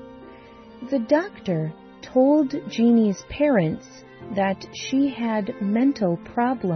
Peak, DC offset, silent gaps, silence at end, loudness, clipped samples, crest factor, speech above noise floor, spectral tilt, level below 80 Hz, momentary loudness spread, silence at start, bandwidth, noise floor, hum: -6 dBFS; under 0.1%; none; 0 s; -23 LUFS; under 0.1%; 16 dB; 23 dB; -7 dB/octave; -56 dBFS; 13 LU; 0 s; 6.4 kHz; -45 dBFS; none